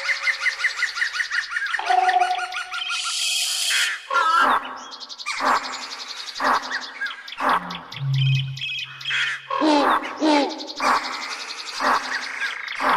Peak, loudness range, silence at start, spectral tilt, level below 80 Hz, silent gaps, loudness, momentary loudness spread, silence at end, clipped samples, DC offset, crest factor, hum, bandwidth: -6 dBFS; 4 LU; 0 s; -3 dB/octave; -66 dBFS; none; -22 LUFS; 11 LU; 0 s; under 0.1%; under 0.1%; 16 dB; none; 14 kHz